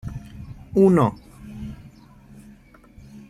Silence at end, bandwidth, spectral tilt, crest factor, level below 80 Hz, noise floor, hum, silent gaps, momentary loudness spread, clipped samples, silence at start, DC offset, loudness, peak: 0.1 s; 12.5 kHz; -9 dB/octave; 20 dB; -46 dBFS; -49 dBFS; none; none; 25 LU; under 0.1%; 0.05 s; under 0.1%; -19 LUFS; -4 dBFS